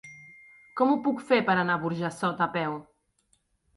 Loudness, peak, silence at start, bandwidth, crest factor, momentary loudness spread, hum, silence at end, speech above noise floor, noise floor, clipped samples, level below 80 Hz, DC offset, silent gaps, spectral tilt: -27 LUFS; -8 dBFS; 0.05 s; 11.5 kHz; 20 dB; 17 LU; none; 0.95 s; 44 dB; -70 dBFS; under 0.1%; -70 dBFS; under 0.1%; none; -6.5 dB/octave